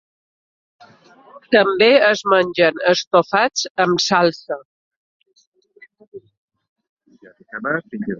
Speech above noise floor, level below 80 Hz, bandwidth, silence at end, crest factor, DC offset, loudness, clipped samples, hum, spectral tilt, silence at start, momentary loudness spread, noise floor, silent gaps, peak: 34 dB; -64 dBFS; 7.6 kHz; 0 s; 18 dB; under 0.1%; -16 LUFS; under 0.1%; none; -3.5 dB/octave; 1.35 s; 15 LU; -50 dBFS; 3.07-3.11 s, 3.70-3.75 s, 4.65-5.20 s, 5.47-5.52 s, 6.08-6.12 s, 6.37-6.48 s, 6.69-6.76 s, 6.89-6.97 s; 0 dBFS